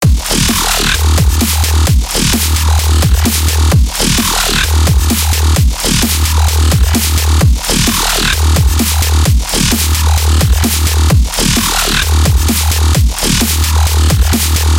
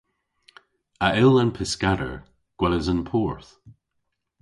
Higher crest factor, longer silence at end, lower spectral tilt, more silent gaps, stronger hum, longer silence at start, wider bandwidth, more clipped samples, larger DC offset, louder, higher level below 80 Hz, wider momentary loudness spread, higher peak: second, 10 dB vs 20 dB; second, 0 s vs 0.7 s; second, -3.5 dB/octave vs -6 dB/octave; neither; neither; second, 0 s vs 1 s; first, 17 kHz vs 11.5 kHz; neither; first, 0.2% vs under 0.1%; first, -11 LUFS vs -23 LUFS; first, -14 dBFS vs -42 dBFS; second, 1 LU vs 14 LU; first, 0 dBFS vs -4 dBFS